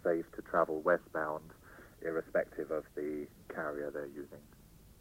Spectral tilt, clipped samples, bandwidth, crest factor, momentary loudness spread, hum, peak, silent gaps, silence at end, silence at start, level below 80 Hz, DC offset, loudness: -7 dB/octave; under 0.1%; 16 kHz; 22 dB; 19 LU; none; -16 dBFS; none; 0.1 s; 0.05 s; -64 dBFS; under 0.1%; -37 LUFS